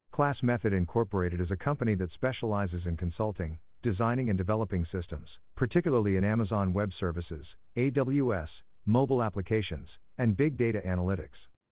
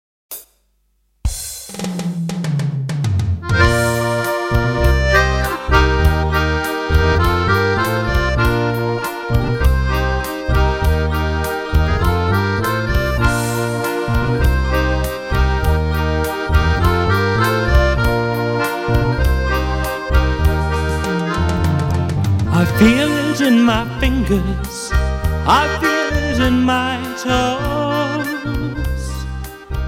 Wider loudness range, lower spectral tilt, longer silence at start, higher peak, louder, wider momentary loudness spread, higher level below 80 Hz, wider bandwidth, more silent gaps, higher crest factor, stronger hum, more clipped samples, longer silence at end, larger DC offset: about the same, 2 LU vs 3 LU; first, -7.5 dB/octave vs -6 dB/octave; second, 0.15 s vs 0.3 s; second, -12 dBFS vs -2 dBFS; second, -31 LUFS vs -17 LUFS; first, 11 LU vs 8 LU; second, -44 dBFS vs -22 dBFS; second, 4 kHz vs 16.5 kHz; neither; about the same, 18 dB vs 14 dB; neither; neither; first, 0.35 s vs 0 s; first, 0.2% vs under 0.1%